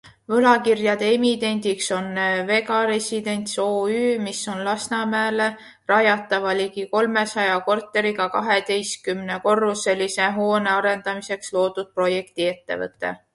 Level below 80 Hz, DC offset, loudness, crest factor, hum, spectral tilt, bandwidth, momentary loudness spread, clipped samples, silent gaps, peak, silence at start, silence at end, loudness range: -66 dBFS; under 0.1%; -21 LUFS; 18 dB; none; -3.5 dB/octave; 11.5 kHz; 7 LU; under 0.1%; none; -2 dBFS; 0.05 s; 0.2 s; 2 LU